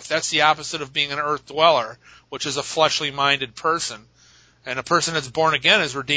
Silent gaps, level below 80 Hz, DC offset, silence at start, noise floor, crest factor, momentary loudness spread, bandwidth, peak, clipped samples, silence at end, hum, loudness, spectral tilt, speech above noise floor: none; -58 dBFS; under 0.1%; 0 s; -54 dBFS; 22 dB; 12 LU; 8 kHz; 0 dBFS; under 0.1%; 0 s; none; -20 LUFS; -2 dB/octave; 32 dB